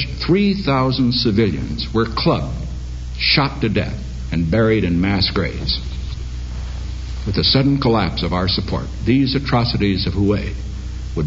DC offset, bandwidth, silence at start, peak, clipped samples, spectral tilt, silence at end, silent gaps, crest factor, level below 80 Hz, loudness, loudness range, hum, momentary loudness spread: under 0.1%; 7.8 kHz; 0 s; -2 dBFS; under 0.1%; -7 dB/octave; 0 s; none; 16 dB; -28 dBFS; -18 LUFS; 2 LU; none; 13 LU